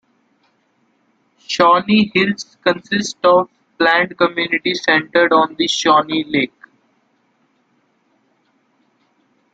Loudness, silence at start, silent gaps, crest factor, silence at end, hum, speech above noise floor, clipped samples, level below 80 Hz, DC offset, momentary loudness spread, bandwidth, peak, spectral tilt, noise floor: -15 LUFS; 1.5 s; none; 18 dB; 3.1 s; none; 47 dB; under 0.1%; -60 dBFS; under 0.1%; 7 LU; 9 kHz; -2 dBFS; -4 dB/octave; -62 dBFS